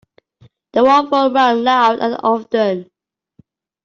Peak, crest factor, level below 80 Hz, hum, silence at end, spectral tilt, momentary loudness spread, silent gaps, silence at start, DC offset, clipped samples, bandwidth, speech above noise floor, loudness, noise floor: -2 dBFS; 14 dB; -62 dBFS; none; 1 s; -5 dB/octave; 7 LU; none; 0.75 s; under 0.1%; under 0.1%; 7.6 kHz; 40 dB; -14 LUFS; -54 dBFS